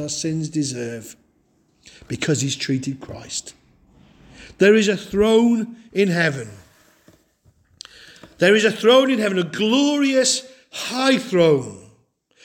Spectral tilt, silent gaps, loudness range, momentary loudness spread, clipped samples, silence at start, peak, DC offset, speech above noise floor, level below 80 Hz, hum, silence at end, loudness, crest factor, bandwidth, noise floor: -4 dB/octave; none; 9 LU; 17 LU; under 0.1%; 0 s; -4 dBFS; under 0.1%; 43 dB; -54 dBFS; none; 0.65 s; -19 LUFS; 18 dB; 17 kHz; -62 dBFS